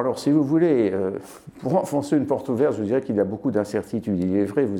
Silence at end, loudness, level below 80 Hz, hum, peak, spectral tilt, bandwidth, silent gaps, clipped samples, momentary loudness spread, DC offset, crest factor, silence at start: 0 s; -23 LUFS; -60 dBFS; none; -8 dBFS; -7.5 dB/octave; 14.5 kHz; none; under 0.1%; 8 LU; under 0.1%; 14 dB; 0 s